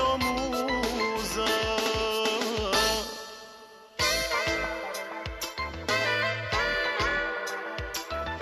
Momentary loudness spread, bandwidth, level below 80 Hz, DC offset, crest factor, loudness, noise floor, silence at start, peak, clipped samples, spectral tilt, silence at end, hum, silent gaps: 10 LU; 13.5 kHz; -46 dBFS; under 0.1%; 18 dB; -28 LUFS; -49 dBFS; 0 s; -12 dBFS; under 0.1%; -2.5 dB/octave; 0 s; none; none